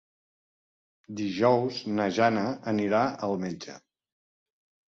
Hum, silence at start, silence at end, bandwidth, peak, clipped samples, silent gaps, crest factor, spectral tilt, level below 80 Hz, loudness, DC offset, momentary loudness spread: none; 1.1 s; 1.1 s; 7.6 kHz; -10 dBFS; under 0.1%; none; 20 dB; -6 dB/octave; -68 dBFS; -27 LUFS; under 0.1%; 13 LU